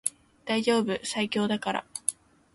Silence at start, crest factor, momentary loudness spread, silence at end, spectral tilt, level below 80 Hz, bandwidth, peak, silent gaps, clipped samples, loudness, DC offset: 0.05 s; 22 dB; 7 LU; 0.4 s; -3 dB/octave; -68 dBFS; 12 kHz; -8 dBFS; none; under 0.1%; -28 LUFS; under 0.1%